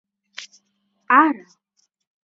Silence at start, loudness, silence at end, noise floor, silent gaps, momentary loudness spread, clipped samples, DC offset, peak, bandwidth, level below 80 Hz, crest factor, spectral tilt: 0.4 s; -17 LUFS; 0.9 s; -69 dBFS; none; 23 LU; under 0.1%; under 0.1%; -2 dBFS; 7.8 kHz; -86 dBFS; 22 dB; -3 dB/octave